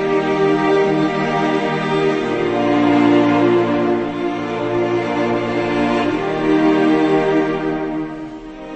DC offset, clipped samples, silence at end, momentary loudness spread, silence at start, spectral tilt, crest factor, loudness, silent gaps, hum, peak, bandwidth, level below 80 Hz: under 0.1%; under 0.1%; 0 s; 8 LU; 0 s; -7 dB/octave; 14 dB; -17 LUFS; none; none; -2 dBFS; 8.4 kHz; -46 dBFS